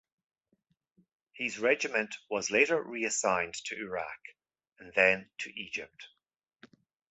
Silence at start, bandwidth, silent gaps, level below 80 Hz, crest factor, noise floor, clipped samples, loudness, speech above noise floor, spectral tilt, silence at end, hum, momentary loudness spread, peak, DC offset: 1.35 s; 8.4 kHz; none; -72 dBFS; 24 dB; -82 dBFS; under 0.1%; -30 LUFS; 50 dB; -2 dB/octave; 1.05 s; none; 13 LU; -10 dBFS; under 0.1%